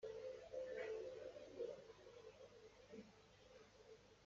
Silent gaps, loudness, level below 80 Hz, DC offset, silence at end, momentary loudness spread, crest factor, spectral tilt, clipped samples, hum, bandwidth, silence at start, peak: none; -55 LUFS; -80 dBFS; under 0.1%; 0 s; 16 LU; 16 dB; -3.5 dB/octave; under 0.1%; none; 7.6 kHz; 0 s; -38 dBFS